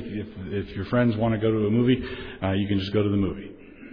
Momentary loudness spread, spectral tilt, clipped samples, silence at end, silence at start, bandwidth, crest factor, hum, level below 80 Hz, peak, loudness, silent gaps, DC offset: 12 LU; -9.5 dB/octave; under 0.1%; 0 s; 0 s; 5.4 kHz; 16 dB; none; -46 dBFS; -10 dBFS; -25 LUFS; none; under 0.1%